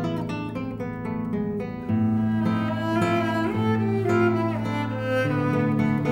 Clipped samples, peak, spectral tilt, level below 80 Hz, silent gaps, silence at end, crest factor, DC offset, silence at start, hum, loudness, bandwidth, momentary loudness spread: under 0.1%; -10 dBFS; -8 dB/octave; -50 dBFS; none; 0 s; 14 dB; under 0.1%; 0 s; none; -25 LUFS; 13 kHz; 8 LU